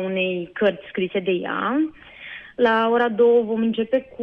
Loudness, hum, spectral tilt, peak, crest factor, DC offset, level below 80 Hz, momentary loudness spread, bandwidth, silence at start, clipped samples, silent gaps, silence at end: -21 LUFS; none; -8 dB/octave; -6 dBFS; 16 dB; under 0.1%; -62 dBFS; 12 LU; 5.2 kHz; 0 s; under 0.1%; none; 0 s